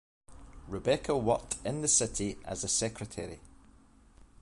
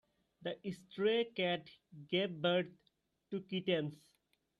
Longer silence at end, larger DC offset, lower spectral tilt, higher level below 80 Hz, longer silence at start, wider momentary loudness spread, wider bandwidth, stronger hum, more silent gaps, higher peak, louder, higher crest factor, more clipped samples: second, 0.15 s vs 0.65 s; neither; second, -3.5 dB/octave vs -6.5 dB/octave; first, -52 dBFS vs -80 dBFS; about the same, 0.3 s vs 0.4 s; first, 16 LU vs 12 LU; about the same, 11.5 kHz vs 11.5 kHz; neither; neither; first, -12 dBFS vs -22 dBFS; first, -31 LUFS vs -38 LUFS; about the same, 22 dB vs 18 dB; neither